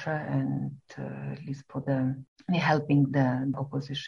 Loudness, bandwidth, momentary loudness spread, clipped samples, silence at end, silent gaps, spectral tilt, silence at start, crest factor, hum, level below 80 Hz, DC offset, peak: -29 LUFS; 6.8 kHz; 14 LU; under 0.1%; 0 s; 2.28-2.36 s; -7.5 dB/octave; 0 s; 18 dB; none; -64 dBFS; under 0.1%; -10 dBFS